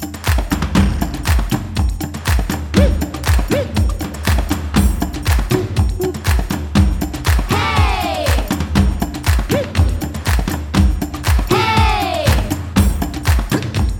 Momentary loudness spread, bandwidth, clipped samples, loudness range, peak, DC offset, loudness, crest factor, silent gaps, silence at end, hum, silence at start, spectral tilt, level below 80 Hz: 5 LU; 19.5 kHz; under 0.1%; 2 LU; 0 dBFS; under 0.1%; -17 LUFS; 14 dB; none; 0 s; none; 0 s; -5.5 dB/octave; -20 dBFS